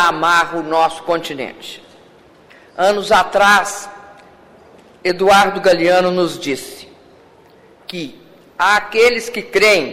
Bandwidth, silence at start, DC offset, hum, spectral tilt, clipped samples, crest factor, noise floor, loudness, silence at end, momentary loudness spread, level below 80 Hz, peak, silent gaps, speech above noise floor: 16 kHz; 0 s; under 0.1%; none; -3 dB/octave; under 0.1%; 14 dB; -46 dBFS; -14 LUFS; 0 s; 21 LU; -50 dBFS; -2 dBFS; none; 32 dB